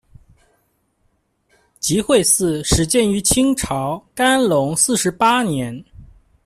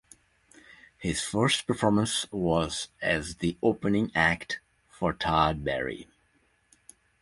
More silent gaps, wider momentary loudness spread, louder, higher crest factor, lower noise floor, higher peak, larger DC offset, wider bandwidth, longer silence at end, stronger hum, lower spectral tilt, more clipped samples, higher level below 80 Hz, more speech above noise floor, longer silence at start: neither; about the same, 9 LU vs 8 LU; first, -16 LUFS vs -28 LUFS; about the same, 18 dB vs 22 dB; about the same, -65 dBFS vs -68 dBFS; first, -2 dBFS vs -8 dBFS; neither; first, 15.5 kHz vs 11.5 kHz; second, 0.4 s vs 1.2 s; neither; about the same, -3.5 dB/octave vs -4.5 dB/octave; neither; first, -38 dBFS vs -50 dBFS; first, 48 dB vs 41 dB; first, 1.85 s vs 0.7 s